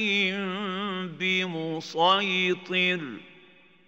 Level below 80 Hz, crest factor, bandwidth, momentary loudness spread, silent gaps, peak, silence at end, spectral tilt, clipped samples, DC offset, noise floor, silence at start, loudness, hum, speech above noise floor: -84 dBFS; 18 dB; 8 kHz; 10 LU; none; -8 dBFS; 0.55 s; -4.5 dB/octave; under 0.1%; under 0.1%; -56 dBFS; 0 s; -26 LUFS; none; 30 dB